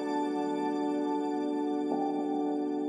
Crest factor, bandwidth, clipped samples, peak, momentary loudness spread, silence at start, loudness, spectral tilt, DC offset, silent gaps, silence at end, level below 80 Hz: 12 dB; 10 kHz; under 0.1%; -18 dBFS; 1 LU; 0 s; -31 LUFS; -6.5 dB/octave; under 0.1%; none; 0 s; under -90 dBFS